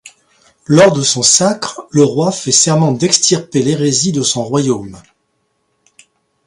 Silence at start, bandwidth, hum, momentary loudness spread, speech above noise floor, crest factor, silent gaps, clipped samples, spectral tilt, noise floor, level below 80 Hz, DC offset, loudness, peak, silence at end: 0.05 s; 11.5 kHz; none; 8 LU; 52 dB; 14 dB; none; under 0.1%; -3.5 dB/octave; -65 dBFS; -52 dBFS; under 0.1%; -12 LUFS; 0 dBFS; 1.45 s